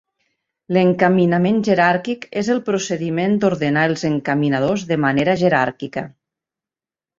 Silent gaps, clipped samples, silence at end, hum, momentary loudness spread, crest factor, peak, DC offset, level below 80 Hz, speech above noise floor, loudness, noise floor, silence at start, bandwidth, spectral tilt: none; under 0.1%; 1.1 s; none; 8 LU; 18 dB; -2 dBFS; under 0.1%; -56 dBFS; over 73 dB; -18 LUFS; under -90 dBFS; 0.7 s; 7.6 kHz; -6.5 dB/octave